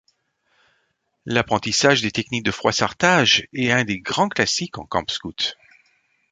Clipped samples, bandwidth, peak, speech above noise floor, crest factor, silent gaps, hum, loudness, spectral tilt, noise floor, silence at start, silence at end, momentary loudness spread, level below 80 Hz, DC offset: under 0.1%; 9.6 kHz; -2 dBFS; 49 dB; 20 dB; none; none; -20 LUFS; -3 dB/octave; -70 dBFS; 1.25 s; 0.8 s; 9 LU; -52 dBFS; under 0.1%